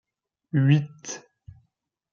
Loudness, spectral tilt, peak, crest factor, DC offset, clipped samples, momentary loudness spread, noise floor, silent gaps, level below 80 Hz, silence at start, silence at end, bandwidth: -23 LUFS; -6.5 dB/octave; -6 dBFS; 20 dB; under 0.1%; under 0.1%; 17 LU; -75 dBFS; none; -66 dBFS; 0.55 s; 0.95 s; 7.2 kHz